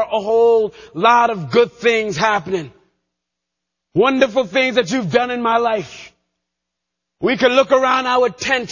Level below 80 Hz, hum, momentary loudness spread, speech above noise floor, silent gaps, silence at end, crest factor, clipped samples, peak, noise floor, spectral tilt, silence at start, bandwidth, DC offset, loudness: -56 dBFS; none; 9 LU; 64 dB; none; 0 s; 16 dB; under 0.1%; 0 dBFS; -80 dBFS; -4.5 dB/octave; 0 s; 7.4 kHz; under 0.1%; -16 LUFS